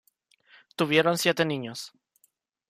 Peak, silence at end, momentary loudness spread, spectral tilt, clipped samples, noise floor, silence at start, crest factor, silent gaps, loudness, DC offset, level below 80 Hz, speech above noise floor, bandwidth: -8 dBFS; 0.8 s; 20 LU; -4 dB/octave; under 0.1%; -70 dBFS; 0.8 s; 20 dB; none; -25 LUFS; under 0.1%; -74 dBFS; 44 dB; 15.5 kHz